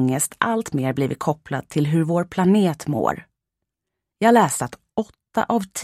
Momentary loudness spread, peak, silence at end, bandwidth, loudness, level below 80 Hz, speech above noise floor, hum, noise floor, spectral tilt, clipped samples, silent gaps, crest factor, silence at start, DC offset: 11 LU; 0 dBFS; 0 s; 16 kHz; -21 LUFS; -58 dBFS; 63 dB; none; -83 dBFS; -5.5 dB/octave; under 0.1%; none; 20 dB; 0 s; under 0.1%